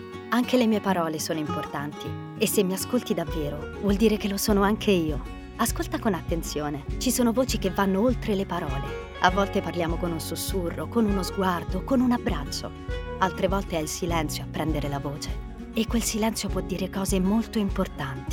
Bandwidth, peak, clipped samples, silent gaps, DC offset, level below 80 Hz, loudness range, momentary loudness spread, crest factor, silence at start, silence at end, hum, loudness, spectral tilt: 19 kHz; -4 dBFS; under 0.1%; none; under 0.1%; -38 dBFS; 3 LU; 10 LU; 22 dB; 0 s; 0 s; none; -26 LUFS; -5 dB/octave